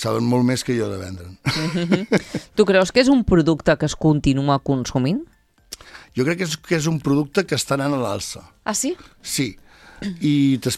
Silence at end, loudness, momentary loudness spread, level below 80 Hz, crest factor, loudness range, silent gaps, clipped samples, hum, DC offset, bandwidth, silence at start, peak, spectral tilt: 0 s; -20 LUFS; 15 LU; -42 dBFS; 20 dB; 5 LU; none; under 0.1%; none; under 0.1%; 15 kHz; 0 s; 0 dBFS; -5.5 dB/octave